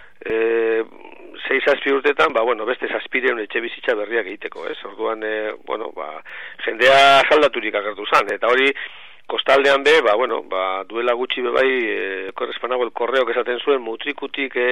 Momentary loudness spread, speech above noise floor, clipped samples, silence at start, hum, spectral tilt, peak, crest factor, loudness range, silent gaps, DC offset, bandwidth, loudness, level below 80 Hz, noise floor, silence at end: 15 LU; 22 dB; under 0.1%; 0.25 s; none; -3 dB/octave; -4 dBFS; 14 dB; 7 LU; none; 0.7%; 13 kHz; -19 LUFS; -62 dBFS; -41 dBFS; 0 s